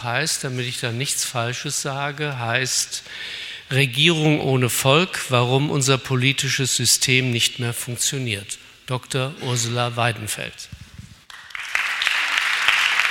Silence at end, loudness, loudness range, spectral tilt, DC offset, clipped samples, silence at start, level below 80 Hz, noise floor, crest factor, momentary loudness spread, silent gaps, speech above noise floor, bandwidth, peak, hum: 0 s; -20 LUFS; 6 LU; -3 dB/octave; under 0.1%; under 0.1%; 0 s; -56 dBFS; -42 dBFS; 20 dB; 13 LU; none; 21 dB; 16.5 kHz; 0 dBFS; none